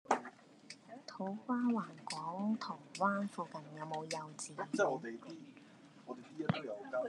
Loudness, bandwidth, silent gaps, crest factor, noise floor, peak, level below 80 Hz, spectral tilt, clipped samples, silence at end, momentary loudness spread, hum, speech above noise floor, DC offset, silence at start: -40 LUFS; 11.5 kHz; none; 24 dB; -60 dBFS; -16 dBFS; -84 dBFS; -5 dB/octave; under 0.1%; 0 s; 18 LU; none; 20 dB; under 0.1%; 0.05 s